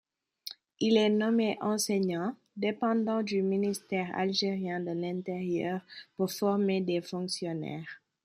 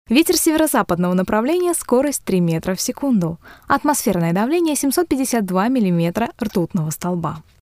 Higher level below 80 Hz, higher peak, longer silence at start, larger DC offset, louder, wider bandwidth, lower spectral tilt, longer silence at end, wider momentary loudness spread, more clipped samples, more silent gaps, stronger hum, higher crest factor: second, -76 dBFS vs -48 dBFS; second, -12 dBFS vs -2 dBFS; first, 0.45 s vs 0.1 s; neither; second, -31 LUFS vs -18 LUFS; about the same, 15 kHz vs 16 kHz; about the same, -5 dB/octave vs -5 dB/octave; about the same, 0.3 s vs 0.2 s; first, 12 LU vs 7 LU; neither; neither; neither; about the same, 18 dB vs 16 dB